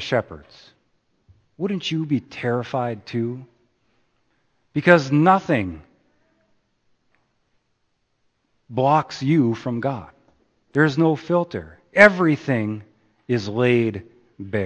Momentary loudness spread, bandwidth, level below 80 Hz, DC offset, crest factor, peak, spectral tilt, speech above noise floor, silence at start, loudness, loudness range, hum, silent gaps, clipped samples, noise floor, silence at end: 17 LU; 8.8 kHz; -58 dBFS; under 0.1%; 22 dB; 0 dBFS; -7 dB/octave; 50 dB; 0 s; -20 LUFS; 8 LU; none; none; under 0.1%; -70 dBFS; 0 s